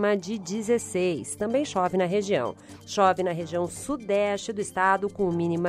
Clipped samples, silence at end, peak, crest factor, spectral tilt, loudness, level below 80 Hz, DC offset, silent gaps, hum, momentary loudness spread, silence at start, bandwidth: under 0.1%; 0 s; -8 dBFS; 18 dB; -5 dB/octave; -26 LUFS; -60 dBFS; under 0.1%; none; none; 7 LU; 0 s; 15 kHz